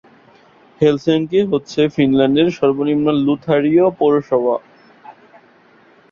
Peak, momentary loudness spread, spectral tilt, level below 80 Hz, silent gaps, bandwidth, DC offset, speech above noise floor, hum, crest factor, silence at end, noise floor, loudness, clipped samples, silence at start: -2 dBFS; 4 LU; -7.5 dB/octave; -54 dBFS; none; 7.2 kHz; under 0.1%; 35 dB; none; 16 dB; 1 s; -50 dBFS; -16 LUFS; under 0.1%; 0.8 s